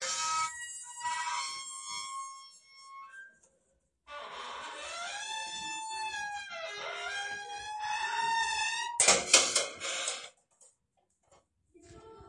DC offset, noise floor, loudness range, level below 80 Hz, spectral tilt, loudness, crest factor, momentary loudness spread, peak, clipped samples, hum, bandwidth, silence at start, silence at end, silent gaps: under 0.1%; -77 dBFS; 15 LU; -72 dBFS; 1 dB/octave; -32 LUFS; 28 dB; 23 LU; -8 dBFS; under 0.1%; none; 11.5 kHz; 0 s; 0 s; none